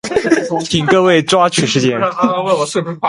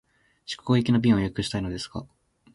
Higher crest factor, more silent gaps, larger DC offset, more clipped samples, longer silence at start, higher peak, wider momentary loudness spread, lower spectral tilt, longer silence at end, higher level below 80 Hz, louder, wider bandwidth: about the same, 14 dB vs 18 dB; neither; neither; neither; second, 0.05 s vs 0.5 s; first, 0 dBFS vs -8 dBFS; second, 5 LU vs 16 LU; second, -4.5 dB/octave vs -6.5 dB/octave; second, 0 s vs 0.5 s; about the same, -50 dBFS vs -48 dBFS; first, -13 LUFS vs -25 LUFS; about the same, 11.5 kHz vs 11.5 kHz